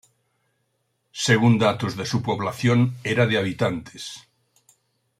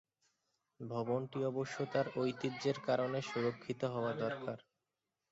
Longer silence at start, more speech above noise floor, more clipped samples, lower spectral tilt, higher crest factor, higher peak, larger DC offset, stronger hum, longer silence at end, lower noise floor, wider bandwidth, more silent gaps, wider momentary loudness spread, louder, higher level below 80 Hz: first, 1.15 s vs 0.8 s; about the same, 51 dB vs 52 dB; neither; about the same, -5.5 dB/octave vs -5.5 dB/octave; about the same, 20 dB vs 18 dB; first, -4 dBFS vs -20 dBFS; neither; neither; first, 1 s vs 0.7 s; second, -72 dBFS vs -89 dBFS; first, 14 kHz vs 8 kHz; neither; first, 18 LU vs 8 LU; first, -22 LUFS vs -38 LUFS; first, -60 dBFS vs -78 dBFS